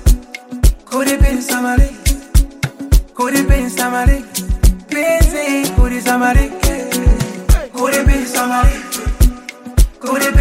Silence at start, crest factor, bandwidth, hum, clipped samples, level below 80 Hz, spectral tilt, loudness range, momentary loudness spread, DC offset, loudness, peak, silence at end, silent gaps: 0 s; 12 dB; 16.5 kHz; none; under 0.1%; -16 dBFS; -5 dB/octave; 1 LU; 6 LU; under 0.1%; -16 LUFS; 0 dBFS; 0 s; none